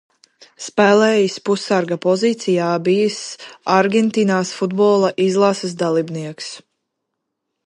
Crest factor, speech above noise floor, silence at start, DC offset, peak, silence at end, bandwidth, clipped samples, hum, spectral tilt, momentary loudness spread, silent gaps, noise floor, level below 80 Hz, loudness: 16 dB; 60 dB; 0.6 s; under 0.1%; -2 dBFS; 1.05 s; 11 kHz; under 0.1%; none; -5 dB/octave; 14 LU; none; -77 dBFS; -70 dBFS; -17 LUFS